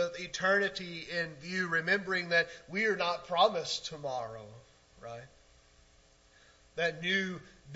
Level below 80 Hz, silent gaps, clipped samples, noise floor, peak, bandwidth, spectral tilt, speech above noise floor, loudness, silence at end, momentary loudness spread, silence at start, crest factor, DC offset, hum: -68 dBFS; none; under 0.1%; -63 dBFS; -12 dBFS; 8 kHz; -3.5 dB/octave; 30 dB; -32 LUFS; 0 s; 19 LU; 0 s; 22 dB; under 0.1%; none